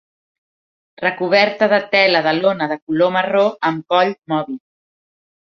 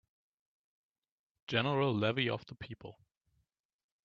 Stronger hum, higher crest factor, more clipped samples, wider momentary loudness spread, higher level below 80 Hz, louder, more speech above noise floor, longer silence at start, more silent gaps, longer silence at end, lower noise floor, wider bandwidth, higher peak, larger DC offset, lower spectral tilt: neither; second, 18 dB vs 24 dB; neither; second, 9 LU vs 20 LU; first, -66 dBFS vs -72 dBFS; first, -16 LUFS vs -33 LUFS; first, over 74 dB vs 47 dB; second, 1 s vs 1.5 s; first, 2.82-2.87 s vs none; second, 0.85 s vs 1.15 s; first, under -90 dBFS vs -81 dBFS; about the same, 6.6 kHz vs 7.2 kHz; first, 0 dBFS vs -14 dBFS; neither; about the same, -6 dB/octave vs -7 dB/octave